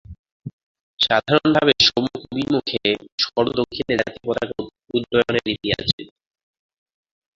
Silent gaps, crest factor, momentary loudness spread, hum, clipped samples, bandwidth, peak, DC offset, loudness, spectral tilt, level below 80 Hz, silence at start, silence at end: 0.19-0.24 s, 0.32-0.40 s, 0.53-0.75 s, 0.81-0.98 s, 3.12-3.18 s, 5.93-5.98 s; 20 dB; 12 LU; none; under 0.1%; 7.6 kHz; -2 dBFS; under 0.1%; -20 LUFS; -4.5 dB/octave; -50 dBFS; 0.1 s; 1.3 s